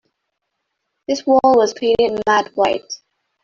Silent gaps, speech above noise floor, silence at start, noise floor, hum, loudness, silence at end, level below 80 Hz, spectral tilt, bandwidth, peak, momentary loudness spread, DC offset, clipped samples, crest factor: none; 60 dB; 1.1 s; -75 dBFS; none; -16 LUFS; 0.5 s; -54 dBFS; -3.5 dB/octave; 7.6 kHz; -2 dBFS; 18 LU; under 0.1%; under 0.1%; 16 dB